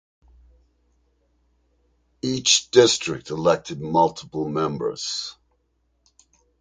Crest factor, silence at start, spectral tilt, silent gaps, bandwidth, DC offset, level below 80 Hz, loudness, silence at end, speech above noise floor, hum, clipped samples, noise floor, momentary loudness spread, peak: 24 dB; 2.25 s; -3 dB/octave; none; 9.6 kHz; under 0.1%; -58 dBFS; -21 LUFS; 1.3 s; 47 dB; none; under 0.1%; -69 dBFS; 13 LU; 0 dBFS